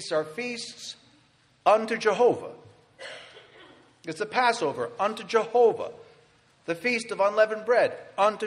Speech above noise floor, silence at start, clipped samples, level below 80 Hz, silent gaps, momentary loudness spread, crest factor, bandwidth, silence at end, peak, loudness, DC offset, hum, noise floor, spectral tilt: 37 dB; 0 s; under 0.1%; -76 dBFS; none; 19 LU; 18 dB; 11.5 kHz; 0 s; -8 dBFS; -25 LUFS; under 0.1%; none; -62 dBFS; -3.5 dB/octave